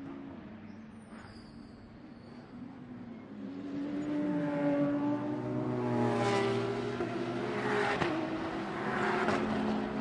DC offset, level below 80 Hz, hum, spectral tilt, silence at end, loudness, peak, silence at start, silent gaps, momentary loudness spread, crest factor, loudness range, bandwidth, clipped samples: under 0.1%; -64 dBFS; none; -6.5 dB/octave; 0 s; -33 LUFS; -16 dBFS; 0 s; none; 19 LU; 18 dB; 15 LU; 11 kHz; under 0.1%